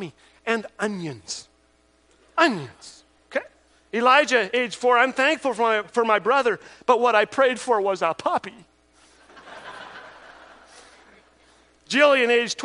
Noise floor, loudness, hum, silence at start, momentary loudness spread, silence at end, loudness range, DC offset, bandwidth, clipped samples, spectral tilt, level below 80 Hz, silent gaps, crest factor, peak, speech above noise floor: -61 dBFS; -21 LUFS; none; 0 s; 21 LU; 0 s; 8 LU; under 0.1%; 10.5 kHz; under 0.1%; -3 dB/octave; -68 dBFS; none; 20 dB; -4 dBFS; 40 dB